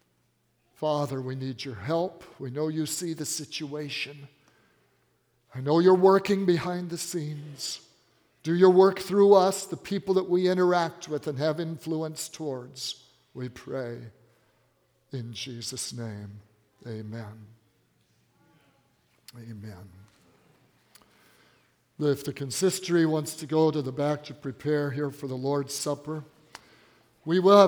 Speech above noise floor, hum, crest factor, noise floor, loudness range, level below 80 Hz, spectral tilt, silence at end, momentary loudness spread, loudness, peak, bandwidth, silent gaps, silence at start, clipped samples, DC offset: 44 dB; none; 24 dB; -71 dBFS; 15 LU; -72 dBFS; -5.5 dB/octave; 0 s; 20 LU; -27 LUFS; -4 dBFS; 20 kHz; none; 0.8 s; under 0.1%; under 0.1%